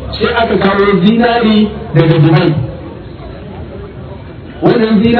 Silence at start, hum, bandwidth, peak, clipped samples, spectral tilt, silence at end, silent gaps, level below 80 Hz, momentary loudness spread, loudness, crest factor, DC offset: 0 s; none; 5.4 kHz; 0 dBFS; 0.6%; -10 dB/octave; 0 s; none; -32 dBFS; 20 LU; -10 LUFS; 12 dB; under 0.1%